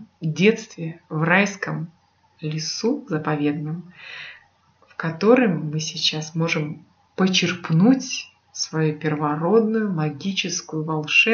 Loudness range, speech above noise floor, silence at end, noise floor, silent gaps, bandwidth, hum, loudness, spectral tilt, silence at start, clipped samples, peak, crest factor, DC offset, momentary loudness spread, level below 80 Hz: 6 LU; 37 dB; 0 s; -58 dBFS; none; 7.2 kHz; none; -22 LUFS; -5 dB/octave; 0 s; under 0.1%; -2 dBFS; 20 dB; under 0.1%; 16 LU; -74 dBFS